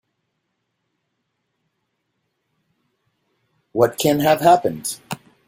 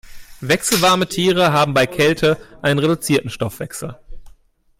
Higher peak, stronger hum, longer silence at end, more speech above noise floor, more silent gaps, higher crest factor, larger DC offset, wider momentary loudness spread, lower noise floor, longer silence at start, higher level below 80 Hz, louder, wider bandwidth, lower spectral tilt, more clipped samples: about the same, -2 dBFS vs -4 dBFS; neither; second, 0.3 s vs 0.5 s; first, 58 dB vs 33 dB; neither; first, 20 dB vs 14 dB; neither; about the same, 15 LU vs 14 LU; first, -74 dBFS vs -50 dBFS; first, 3.75 s vs 0.05 s; second, -60 dBFS vs -44 dBFS; about the same, -18 LUFS vs -17 LUFS; about the same, 16 kHz vs 16.5 kHz; about the same, -4.5 dB/octave vs -4 dB/octave; neither